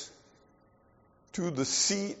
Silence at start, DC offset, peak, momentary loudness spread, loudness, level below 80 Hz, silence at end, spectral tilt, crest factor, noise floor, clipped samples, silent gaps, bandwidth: 0 s; under 0.1%; -16 dBFS; 16 LU; -29 LUFS; -70 dBFS; 0 s; -3.5 dB/octave; 18 dB; -64 dBFS; under 0.1%; none; 8 kHz